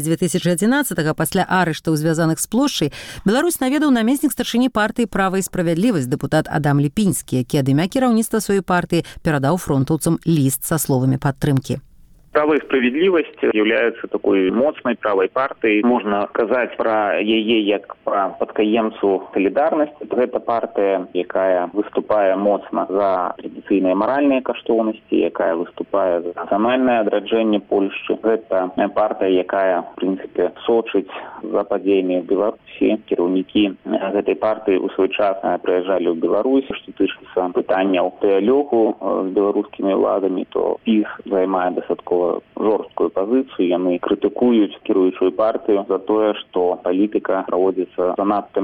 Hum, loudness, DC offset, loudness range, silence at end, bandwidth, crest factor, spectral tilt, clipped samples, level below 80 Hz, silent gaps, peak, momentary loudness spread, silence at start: none; -19 LUFS; under 0.1%; 2 LU; 0 s; 18 kHz; 16 dB; -5.5 dB/octave; under 0.1%; -50 dBFS; none; -2 dBFS; 5 LU; 0 s